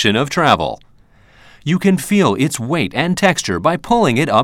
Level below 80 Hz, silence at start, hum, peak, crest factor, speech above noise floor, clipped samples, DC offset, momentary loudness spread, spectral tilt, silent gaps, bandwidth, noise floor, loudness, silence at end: -46 dBFS; 0 s; none; 0 dBFS; 16 dB; 33 dB; under 0.1%; under 0.1%; 6 LU; -5 dB/octave; none; 16 kHz; -48 dBFS; -15 LUFS; 0 s